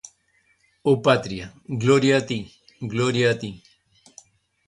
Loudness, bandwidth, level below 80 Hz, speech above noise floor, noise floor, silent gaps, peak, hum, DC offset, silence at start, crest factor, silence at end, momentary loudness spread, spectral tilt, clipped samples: -22 LUFS; 11 kHz; -56 dBFS; 43 dB; -65 dBFS; none; -6 dBFS; none; under 0.1%; 0.85 s; 18 dB; 1.1 s; 16 LU; -5.5 dB/octave; under 0.1%